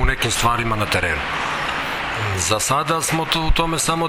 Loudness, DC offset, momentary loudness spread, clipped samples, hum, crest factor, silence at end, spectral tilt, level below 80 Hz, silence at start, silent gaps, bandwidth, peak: -19 LUFS; under 0.1%; 4 LU; under 0.1%; none; 18 dB; 0 s; -3 dB/octave; -28 dBFS; 0 s; none; 17 kHz; -2 dBFS